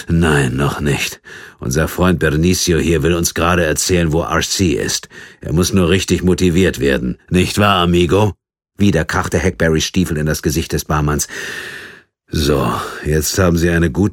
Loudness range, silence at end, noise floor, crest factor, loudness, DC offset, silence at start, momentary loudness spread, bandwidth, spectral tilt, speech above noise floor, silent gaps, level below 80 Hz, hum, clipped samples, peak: 4 LU; 0 s; -39 dBFS; 16 dB; -15 LUFS; under 0.1%; 0 s; 8 LU; 17.5 kHz; -5 dB/octave; 25 dB; none; -30 dBFS; none; under 0.1%; 0 dBFS